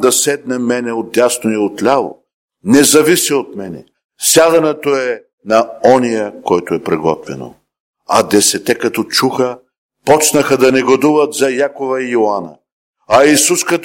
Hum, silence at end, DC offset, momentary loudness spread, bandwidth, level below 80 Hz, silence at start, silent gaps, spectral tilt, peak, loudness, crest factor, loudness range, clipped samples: none; 0 s; under 0.1%; 14 LU; 17 kHz; -54 dBFS; 0 s; 2.34-2.48 s, 4.05-4.09 s, 5.33-5.38 s, 7.80-7.93 s, 9.78-9.89 s, 12.72-12.93 s; -3 dB/octave; 0 dBFS; -12 LUFS; 14 dB; 3 LU; under 0.1%